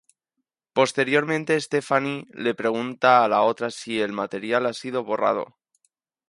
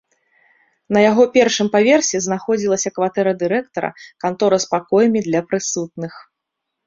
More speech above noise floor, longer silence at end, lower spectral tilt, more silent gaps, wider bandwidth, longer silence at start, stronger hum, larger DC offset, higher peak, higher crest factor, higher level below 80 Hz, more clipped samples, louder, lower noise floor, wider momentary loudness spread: second, 58 dB vs 62 dB; first, 0.85 s vs 0.65 s; about the same, -4.5 dB/octave vs -4 dB/octave; neither; first, 11.5 kHz vs 7.8 kHz; second, 0.75 s vs 0.9 s; neither; neither; about the same, -4 dBFS vs -2 dBFS; about the same, 20 dB vs 16 dB; second, -72 dBFS vs -60 dBFS; neither; second, -23 LUFS vs -17 LUFS; about the same, -81 dBFS vs -79 dBFS; about the same, 11 LU vs 12 LU